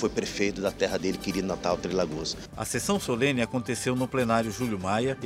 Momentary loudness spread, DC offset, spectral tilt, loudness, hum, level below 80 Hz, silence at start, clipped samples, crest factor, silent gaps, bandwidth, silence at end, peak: 5 LU; under 0.1%; -4.5 dB/octave; -28 LUFS; none; -50 dBFS; 0 s; under 0.1%; 18 dB; none; 16 kHz; 0 s; -10 dBFS